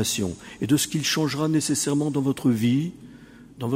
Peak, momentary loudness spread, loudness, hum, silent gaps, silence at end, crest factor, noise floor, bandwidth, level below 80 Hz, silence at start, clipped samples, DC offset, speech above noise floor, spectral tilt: -8 dBFS; 9 LU; -24 LUFS; none; none; 0 s; 16 dB; -46 dBFS; 16 kHz; -56 dBFS; 0 s; under 0.1%; under 0.1%; 23 dB; -4.5 dB/octave